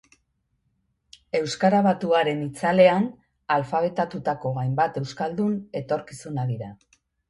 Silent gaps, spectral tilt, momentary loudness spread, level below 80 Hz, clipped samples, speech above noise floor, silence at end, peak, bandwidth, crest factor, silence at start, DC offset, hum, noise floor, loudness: none; -6.5 dB/octave; 12 LU; -62 dBFS; under 0.1%; 49 dB; 0.55 s; -4 dBFS; 11.5 kHz; 20 dB; 1.35 s; under 0.1%; none; -72 dBFS; -24 LUFS